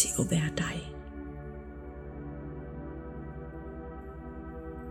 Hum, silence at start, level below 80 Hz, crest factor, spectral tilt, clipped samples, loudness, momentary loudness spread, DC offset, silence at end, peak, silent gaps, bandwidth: none; 0 s; -46 dBFS; 26 dB; -4.5 dB/octave; under 0.1%; -37 LUFS; 15 LU; under 0.1%; 0 s; -10 dBFS; none; 15 kHz